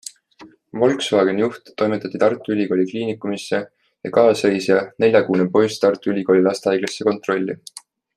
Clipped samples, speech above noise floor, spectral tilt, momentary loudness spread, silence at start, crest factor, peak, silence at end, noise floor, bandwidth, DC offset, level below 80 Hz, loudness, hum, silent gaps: under 0.1%; 29 dB; -5.5 dB/octave; 10 LU; 0.4 s; 18 dB; -2 dBFS; 0.35 s; -47 dBFS; 13 kHz; under 0.1%; -66 dBFS; -19 LUFS; none; none